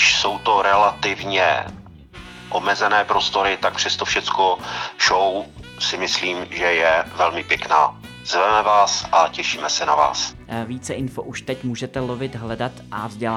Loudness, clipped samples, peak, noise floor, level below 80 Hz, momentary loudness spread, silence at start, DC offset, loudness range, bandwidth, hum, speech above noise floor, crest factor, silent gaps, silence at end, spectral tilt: -19 LUFS; under 0.1%; -2 dBFS; -40 dBFS; -50 dBFS; 12 LU; 0 s; under 0.1%; 5 LU; 14 kHz; none; 20 dB; 18 dB; none; 0 s; -2.5 dB/octave